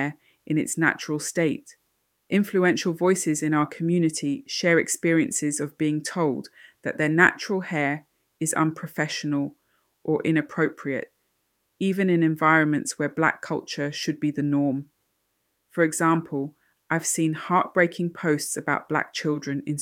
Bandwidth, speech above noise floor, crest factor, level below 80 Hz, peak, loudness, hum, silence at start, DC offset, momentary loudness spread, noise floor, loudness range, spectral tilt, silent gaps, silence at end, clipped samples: 16.5 kHz; 50 dB; 22 dB; -72 dBFS; -4 dBFS; -24 LUFS; none; 0 s; under 0.1%; 10 LU; -74 dBFS; 4 LU; -5 dB/octave; none; 0 s; under 0.1%